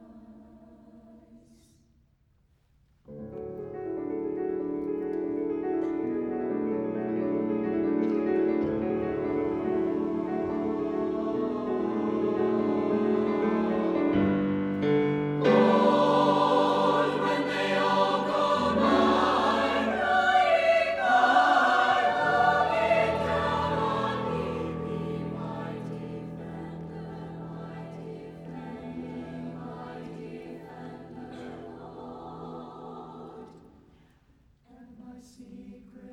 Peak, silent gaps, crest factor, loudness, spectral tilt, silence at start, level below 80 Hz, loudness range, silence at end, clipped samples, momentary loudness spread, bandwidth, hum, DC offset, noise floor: -8 dBFS; none; 20 dB; -26 LUFS; -6.5 dB/octave; 0 s; -56 dBFS; 19 LU; 0 s; under 0.1%; 20 LU; 11.5 kHz; none; under 0.1%; -66 dBFS